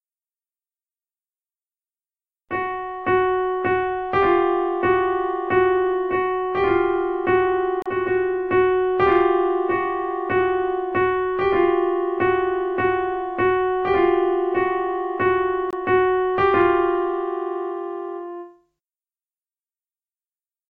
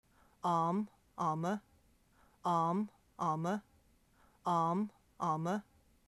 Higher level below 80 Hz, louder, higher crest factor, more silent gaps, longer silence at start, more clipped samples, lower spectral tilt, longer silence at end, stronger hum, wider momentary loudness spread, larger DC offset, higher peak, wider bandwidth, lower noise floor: first, -50 dBFS vs -74 dBFS; first, -21 LUFS vs -37 LUFS; about the same, 16 dB vs 16 dB; neither; first, 2.5 s vs 0.45 s; neither; first, -8.5 dB/octave vs -7 dB/octave; first, 2.2 s vs 0.45 s; neither; about the same, 8 LU vs 10 LU; neither; first, -6 dBFS vs -22 dBFS; second, 4.7 kHz vs 12.5 kHz; first, under -90 dBFS vs -69 dBFS